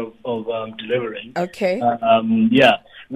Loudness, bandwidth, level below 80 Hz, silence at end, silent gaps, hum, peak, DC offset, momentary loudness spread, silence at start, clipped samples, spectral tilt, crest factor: -19 LUFS; 12.5 kHz; -58 dBFS; 0 s; none; none; -2 dBFS; under 0.1%; 13 LU; 0 s; under 0.1%; -6 dB/octave; 18 dB